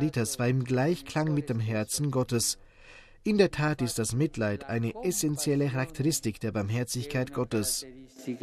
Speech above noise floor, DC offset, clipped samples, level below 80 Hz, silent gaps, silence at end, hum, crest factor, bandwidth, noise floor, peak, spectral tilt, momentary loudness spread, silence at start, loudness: 24 dB; under 0.1%; under 0.1%; -54 dBFS; none; 0.05 s; none; 20 dB; 14.5 kHz; -52 dBFS; -10 dBFS; -5 dB/octave; 5 LU; 0 s; -29 LUFS